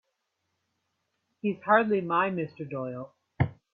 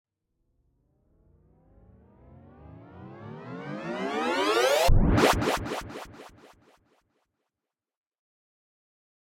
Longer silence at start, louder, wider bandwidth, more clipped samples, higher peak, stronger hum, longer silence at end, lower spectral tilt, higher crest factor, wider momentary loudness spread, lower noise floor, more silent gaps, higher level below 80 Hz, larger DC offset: second, 1.45 s vs 2.7 s; about the same, -28 LUFS vs -26 LUFS; second, 4.8 kHz vs 16.5 kHz; neither; about the same, -10 dBFS vs -8 dBFS; neither; second, 0.2 s vs 3 s; first, -10 dB/octave vs -5 dB/octave; about the same, 22 dB vs 22 dB; second, 14 LU vs 24 LU; second, -80 dBFS vs -89 dBFS; neither; second, -60 dBFS vs -36 dBFS; neither